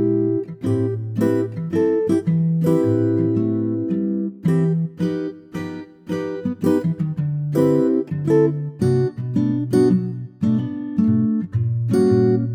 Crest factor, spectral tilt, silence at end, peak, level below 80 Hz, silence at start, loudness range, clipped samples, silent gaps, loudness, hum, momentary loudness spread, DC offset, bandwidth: 14 dB; -9.5 dB/octave; 0 s; -4 dBFS; -58 dBFS; 0 s; 4 LU; under 0.1%; none; -20 LUFS; none; 8 LU; under 0.1%; 15 kHz